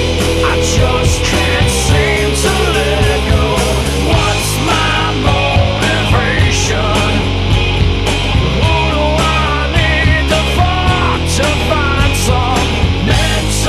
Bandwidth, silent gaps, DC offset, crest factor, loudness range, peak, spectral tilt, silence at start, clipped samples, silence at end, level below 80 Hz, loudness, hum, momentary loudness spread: 15 kHz; none; under 0.1%; 12 dB; 1 LU; 0 dBFS; -4.5 dB/octave; 0 s; under 0.1%; 0 s; -18 dBFS; -12 LUFS; none; 2 LU